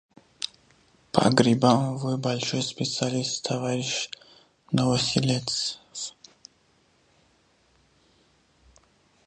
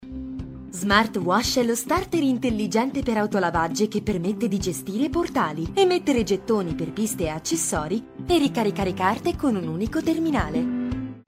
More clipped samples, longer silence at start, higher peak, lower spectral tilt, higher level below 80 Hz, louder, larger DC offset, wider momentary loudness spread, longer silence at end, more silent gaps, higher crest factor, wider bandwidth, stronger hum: neither; first, 0.4 s vs 0 s; first, 0 dBFS vs -4 dBFS; about the same, -4.5 dB/octave vs -4.5 dB/octave; second, -62 dBFS vs -42 dBFS; about the same, -25 LUFS vs -24 LUFS; neither; first, 15 LU vs 7 LU; first, 3.15 s vs 0.05 s; neither; first, 28 dB vs 20 dB; second, 10.5 kHz vs 16 kHz; neither